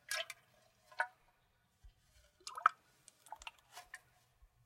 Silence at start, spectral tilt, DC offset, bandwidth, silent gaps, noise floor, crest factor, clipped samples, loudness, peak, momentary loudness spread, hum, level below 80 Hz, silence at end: 0.1 s; 1 dB/octave; under 0.1%; 16 kHz; none; -76 dBFS; 34 dB; under 0.1%; -40 LUFS; -12 dBFS; 23 LU; none; -74 dBFS; 0.7 s